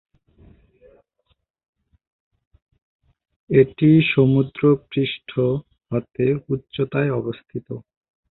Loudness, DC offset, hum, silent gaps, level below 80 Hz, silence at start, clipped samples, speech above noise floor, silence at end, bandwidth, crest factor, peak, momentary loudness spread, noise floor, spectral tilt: -20 LUFS; under 0.1%; none; none; -54 dBFS; 3.5 s; under 0.1%; 49 dB; 0.5 s; 4.2 kHz; 20 dB; -2 dBFS; 16 LU; -69 dBFS; -12 dB/octave